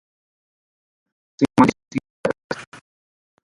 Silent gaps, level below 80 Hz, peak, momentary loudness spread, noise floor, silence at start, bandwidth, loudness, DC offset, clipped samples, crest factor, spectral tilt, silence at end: 2.10-2.24 s, 2.44-2.50 s; -56 dBFS; 0 dBFS; 15 LU; under -90 dBFS; 1.4 s; 11.5 kHz; -21 LUFS; under 0.1%; under 0.1%; 24 dB; -6.5 dB/octave; 0.8 s